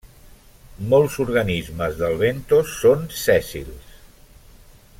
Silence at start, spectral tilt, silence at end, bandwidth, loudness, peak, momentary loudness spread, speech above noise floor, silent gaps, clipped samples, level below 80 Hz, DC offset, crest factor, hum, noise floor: 0.05 s; -5.5 dB/octave; 1 s; 16.5 kHz; -20 LUFS; -4 dBFS; 15 LU; 28 dB; none; under 0.1%; -42 dBFS; under 0.1%; 18 dB; none; -47 dBFS